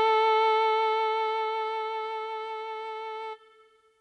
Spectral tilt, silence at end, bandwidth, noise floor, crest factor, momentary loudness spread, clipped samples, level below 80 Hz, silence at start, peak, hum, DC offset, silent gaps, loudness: -0.5 dB/octave; 0.65 s; 9.2 kHz; -60 dBFS; 12 dB; 14 LU; under 0.1%; -80 dBFS; 0 s; -16 dBFS; none; under 0.1%; none; -28 LUFS